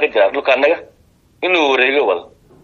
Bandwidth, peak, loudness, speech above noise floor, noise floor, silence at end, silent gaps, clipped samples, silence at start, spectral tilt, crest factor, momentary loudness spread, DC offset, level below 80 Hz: 7 kHz; 0 dBFS; -15 LUFS; 27 dB; -42 dBFS; 0.4 s; none; under 0.1%; 0 s; -3 dB/octave; 16 dB; 10 LU; under 0.1%; -58 dBFS